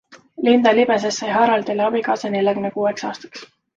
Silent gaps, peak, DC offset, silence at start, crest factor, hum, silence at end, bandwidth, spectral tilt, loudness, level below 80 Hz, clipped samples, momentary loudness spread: none; -2 dBFS; under 0.1%; 0.1 s; 16 dB; none; 0.3 s; 7.6 kHz; -4.5 dB/octave; -18 LUFS; -64 dBFS; under 0.1%; 14 LU